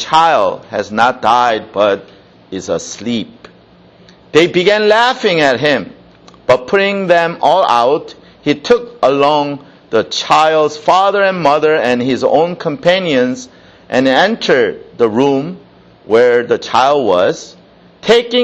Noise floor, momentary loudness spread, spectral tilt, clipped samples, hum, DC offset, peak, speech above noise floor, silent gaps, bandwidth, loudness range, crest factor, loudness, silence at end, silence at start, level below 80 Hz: -44 dBFS; 10 LU; -4.5 dB/octave; under 0.1%; none; under 0.1%; 0 dBFS; 32 dB; none; 9.2 kHz; 3 LU; 12 dB; -12 LUFS; 0 s; 0 s; -52 dBFS